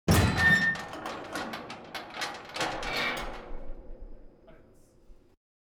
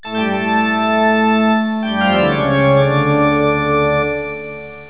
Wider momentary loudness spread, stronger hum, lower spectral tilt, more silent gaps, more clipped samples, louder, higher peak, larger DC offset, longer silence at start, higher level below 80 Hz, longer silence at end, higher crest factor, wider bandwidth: first, 25 LU vs 6 LU; neither; second, -4.5 dB/octave vs -10.5 dB/octave; neither; neither; second, -29 LUFS vs -15 LUFS; second, -12 dBFS vs -2 dBFS; second, under 0.1% vs 0.6%; about the same, 0.05 s vs 0.05 s; about the same, -44 dBFS vs -42 dBFS; first, 0.5 s vs 0 s; first, 20 dB vs 14 dB; first, over 20 kHz vs 4 kHz